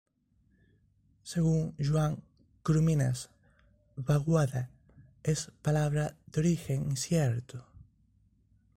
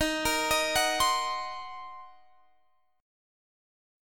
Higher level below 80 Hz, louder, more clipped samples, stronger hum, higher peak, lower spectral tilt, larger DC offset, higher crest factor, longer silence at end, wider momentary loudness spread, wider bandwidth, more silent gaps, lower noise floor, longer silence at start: about the same, -56 dBFS vs -54 dBFS; second, -31 LUFS vs -27 LUFS; neither; neither; second, -16 dBFS vs -12 dBFS; first, -6.5 dB/octave vs -1 dB/octave; neither; about the same, 16 dB vs 20 dB; first, 0.95 s vs 0 s; second, 15 LU vs 19 LU; second, 15 kHz vs 17.5 kHz; neither; about the same, -70 dBFS vs -71 dBFS; first, 1.25 s vs 0 s